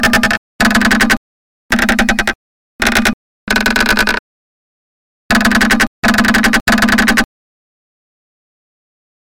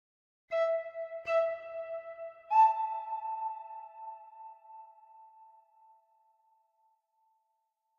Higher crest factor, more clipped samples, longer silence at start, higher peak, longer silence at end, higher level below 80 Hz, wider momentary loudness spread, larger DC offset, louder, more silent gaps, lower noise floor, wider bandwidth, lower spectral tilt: second, 14 dB vs 20 dB; neither; second, 0 s vs 0.5 s; first, -2 dBFS vs -14 dBFS; second, 2.15 s vs 2.55 s; first, -30 dBFS vs -86 dBFS; second, 7 LU vs 25 LU; neither; first, -12 LUFS vs -32 LUFS; first, 0.38-0.59 s, 1.17-1.69 s, 2.35-2.79 s, 3.14-3.47 s, 4.19-5.29 s, 5.87-6.02 s, 6.61-6.66 s vs none; first, under -90 dBFS vs -81 dBFS; first, 17 kHz vs 7 kHz; about the same, -3 dB/octave vs -2 dB/octave